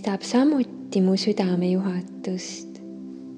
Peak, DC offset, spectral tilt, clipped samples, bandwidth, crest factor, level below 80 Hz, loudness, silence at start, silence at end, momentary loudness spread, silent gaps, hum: -8 dBFS; under 0.1%; -6 dB/octave; under 0.1%; 9.6 kHz; 16 dB; -74 dBFS; -24 LUFS; 0 s; 0 s; 17 LU; none; none